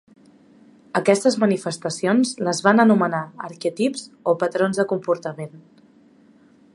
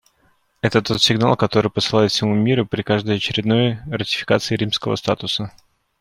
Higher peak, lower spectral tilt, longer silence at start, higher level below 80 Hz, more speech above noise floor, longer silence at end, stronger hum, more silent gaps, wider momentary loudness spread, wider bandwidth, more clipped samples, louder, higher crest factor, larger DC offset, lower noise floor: about the same, 0 dBFS vs -2 dBFS; about the same, -5 dB/octave vs -5 dB/octave; first, 0.95 s vs 0.65 s; second, -72 dBFS vs -52 dBFS; second, 33 dB vs 42 dB; first, 1.15 s vs 0.5 s; neither; neither; first, 12 LU vs 6 LU; second, 11.5 kHz vs 16 kHz; neither; about the same, -21 LUFS vs -19 LUFS; about the same, 22 dB vs 18 dB; neither; second, -53 dBFS vs -61 dBFS